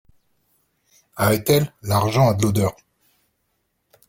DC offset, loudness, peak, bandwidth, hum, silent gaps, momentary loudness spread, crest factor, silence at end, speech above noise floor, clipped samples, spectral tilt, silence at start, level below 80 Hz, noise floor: under 0.1%; -20 LUFS; -2 dBFS; 16.5 kHz; none; none; 6 LU; 20 dB; 1.35 s; 53 dB; under 0.1%; -5.5 dB/octave; 1.15 s; -50 dBFS; -71 dBFS